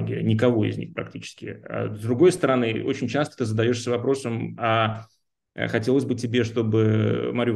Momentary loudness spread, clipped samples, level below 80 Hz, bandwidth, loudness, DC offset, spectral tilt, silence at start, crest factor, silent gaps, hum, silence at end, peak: 13 LU; under 0.1%; -64 dBFS; 12 kHz; -23 LUFS; under 0.1%; -6.5 dB/octave; 0 s; 18 dB; none; none; 0 s; -6 dBFS